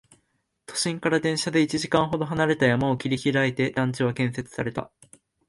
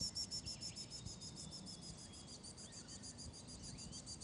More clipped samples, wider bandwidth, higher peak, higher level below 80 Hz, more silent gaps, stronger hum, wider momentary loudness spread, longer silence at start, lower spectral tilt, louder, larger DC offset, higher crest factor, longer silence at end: neither; about the same, 11.5 kHz vs 11.5 kHz; first, -8 dBFS vs -32 dBFS; first, -56 dBFS vs -64 dBFS; neither; neither; about the same, 9 LU vs 9 LU; first, 0.7 s vs 0 s; first, -5 dB/octave vs -2.5 dB/octave; first, -24 LUFS vs -49 LUFS; neither; about the same, 18 dB vs 20 dB; first, 0.65 s vs 0 s